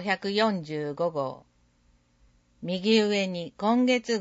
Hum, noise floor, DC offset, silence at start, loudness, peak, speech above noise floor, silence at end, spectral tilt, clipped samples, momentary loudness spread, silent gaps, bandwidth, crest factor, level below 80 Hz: 60 Hz at -55 dBFS; -65 dBFS; under 0.1%; 0 s; -26 LUFS; -10 dBFS; 38 dB; 0 s; -5 dB/octave; under 0.1%; 11 LU; none; 8 kHz; 16 dB; -68 dBFS